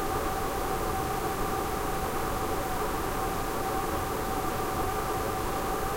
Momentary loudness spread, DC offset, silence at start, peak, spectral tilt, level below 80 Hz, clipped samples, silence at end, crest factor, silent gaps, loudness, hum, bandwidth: 1 LU; 0.1%; 0 s; -16 dBFS; -4.5 dB/octave; -38 dBFS; under 0.1%; 0 s; 14 dB; none; -31 LUFS; none; 16 kHz